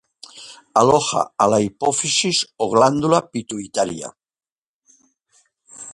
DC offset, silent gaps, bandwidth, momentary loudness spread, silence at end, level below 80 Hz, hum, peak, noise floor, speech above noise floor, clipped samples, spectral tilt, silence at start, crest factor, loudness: under 0.1%; 4.52-4.81 s; 11.5 kHz; 20 LU; 0 s; -58 dBFS; none; 0 dBFS; under -90 dBFS; over 72 dB; under 0.1%; -3.5 dB/octave; 0.35 s; 20 dB; -18 LUFS